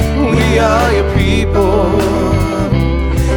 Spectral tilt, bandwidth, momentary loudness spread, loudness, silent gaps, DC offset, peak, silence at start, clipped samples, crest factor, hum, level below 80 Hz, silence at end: -6.5 dB/octave; 19 kHz; 4 LU; -13 LUFS; none; under 0.1%; 0 dBFS; 0 s; under 0.1%; 12 dB; none; -18 dBFS; 0 s